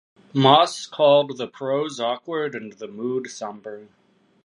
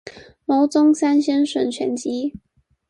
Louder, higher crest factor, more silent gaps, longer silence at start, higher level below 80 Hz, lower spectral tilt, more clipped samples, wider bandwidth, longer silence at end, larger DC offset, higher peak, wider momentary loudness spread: about the same, -21 LUFS vs -19 LUFS; first, 22 dB vs 14 dB; neither; first, 0.35 s vs 0.05 s; second, -74 dBFS vs -62 dBFS; about the same, -5 dB/octave vs -4 dB/octave; neither; about the same, 11.5 kHz vs 11 kHz; about the same, 0.6 s vs 0.5 s; neither; first, -2 dBFS vs -6 dBFS; first, 19 LU vs 11 LU